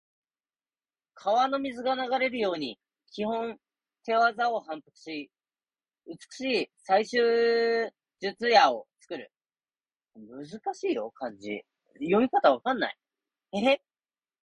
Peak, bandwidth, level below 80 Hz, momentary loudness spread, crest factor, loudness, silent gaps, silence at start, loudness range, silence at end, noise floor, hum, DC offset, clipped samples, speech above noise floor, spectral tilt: -6 dBFS; 11 kHz; -74 dBFS; 18 LU; 22 dB; -27 LUFS; none; 1.25 s; 6 LU; 0.65 s; under -90 dBFS; none; under 0.1%; under 0.1%; over 63 dB; -4.5 dB/octave